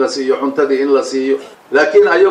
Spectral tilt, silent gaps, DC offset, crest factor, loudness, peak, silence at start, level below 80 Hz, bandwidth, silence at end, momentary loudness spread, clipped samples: -3.5 dB/octave; none; under 0.1%; 12 dB; -14 LUFS; 0 dBFS; 0 s; -62 dBFS; 10 kHz; 0 s; 7 LU; under 0.1%